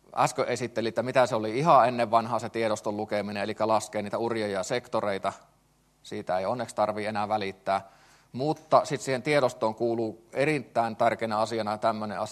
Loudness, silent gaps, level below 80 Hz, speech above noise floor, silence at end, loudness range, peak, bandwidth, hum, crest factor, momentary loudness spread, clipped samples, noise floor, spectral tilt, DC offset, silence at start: -27 LUFS; none; -70 dBFS; 38 dB; 0 s; 5 LU; -6 dBFS; 13 kHz; none; 22 dB; 7 LU; under 0.1%; -65 dBFS; -5 dB/octave; under 0.1%; 0.1 s